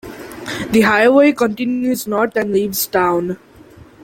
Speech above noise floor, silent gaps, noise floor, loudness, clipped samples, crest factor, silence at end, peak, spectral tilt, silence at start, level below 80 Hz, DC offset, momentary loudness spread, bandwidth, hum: 27 dB; none; -42 dBFS; -15 LUFS; under 0.1%; 14 dB; 0.25 s; -2 dBFS; -4.5 dB/octave; 0.05 s; -50 dBFS; under 0.1%; 15 LU; 17 kHz; none